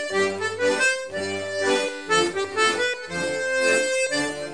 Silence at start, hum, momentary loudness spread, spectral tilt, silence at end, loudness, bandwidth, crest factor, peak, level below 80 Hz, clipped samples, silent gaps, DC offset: 0 s; none; 7 LU; -2 dB/octave; 0 s; -23 LUFS; 10.5 kHz; 16 dB; -8 dBFS; -62 dBFS; under 0.1%; none; 0.3%